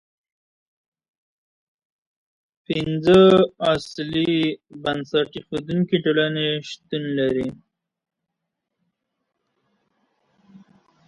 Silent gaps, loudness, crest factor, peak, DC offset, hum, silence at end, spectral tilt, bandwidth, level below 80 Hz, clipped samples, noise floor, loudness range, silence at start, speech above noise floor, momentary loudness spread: none; -21 LUFS; 22 dB; -2 dBFS; under 0.1%; none; 3.55 s; -6.5 dB/octave; 11 kHz; -56 dBFS; under 0.1%; -81 dBFS; 11 LU; 2.7 s; 61 dB; 14 LU